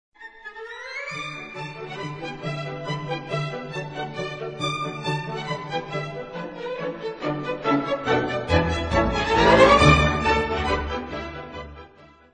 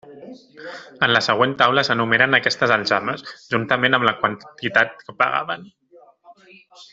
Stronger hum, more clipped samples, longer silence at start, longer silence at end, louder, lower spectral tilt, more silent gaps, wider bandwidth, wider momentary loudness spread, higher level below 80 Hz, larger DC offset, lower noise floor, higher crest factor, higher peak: neither; neither; first, 0.2 s vs 0.05 s; first, 0.25 s vs 0.1 s; second, -23 LUFS vs -18 LUFS; about the same, -5.5 dB/octave vs -4.5 dB/octave; neither; first, 10 kHz vs 8 kHz; first, 18 LU vs 15 LU; first, -38 dBFS vs -62 dBFS; neither; about the same, -50 dBFS vs -50 dBFS; about the same, 22 dB vs 20 dB; about the same, -2 dBFS vs 0 dBFS